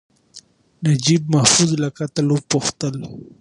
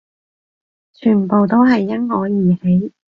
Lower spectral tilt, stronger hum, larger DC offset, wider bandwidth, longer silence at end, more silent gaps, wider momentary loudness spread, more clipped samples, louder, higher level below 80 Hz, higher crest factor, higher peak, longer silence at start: second, -4 dB/octave vs -10 dB/octave; neither; neither; first, 11.5 kHz vs 5.8 kHz; about the same, 0.15 s vs 0.25 s; neither; first, 13 LU vs 7 LU; neither; second, -18 LUFS vs -15 LUFS; about the same, -56 dBFS vs -54 dBFS; first, 20 dB vs 14 dB; about the same, 0 dBFS vs -2 dBFS; second, 0.35 s vs 1 s